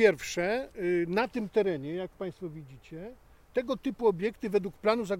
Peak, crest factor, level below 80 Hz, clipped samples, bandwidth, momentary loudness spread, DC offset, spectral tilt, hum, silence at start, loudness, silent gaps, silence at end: -10 dBFS; 20 dB; -60 dBFS; under 0.1%; 16 kHz; 16 LU; under 0.1%; -5.5 dB/octave; none; 0 s; -31 LUFS; none; 0 s